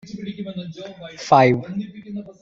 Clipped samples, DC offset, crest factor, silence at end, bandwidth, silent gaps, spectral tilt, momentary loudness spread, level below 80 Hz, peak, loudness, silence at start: under 0.1%; under 0.1%; 20 dB; 0.1 s; 7.8 kHz; none; -6.5 dB/octave; 20 LU; -58 dBFS; -2 dBFS; -19 LUFS; 0.05 s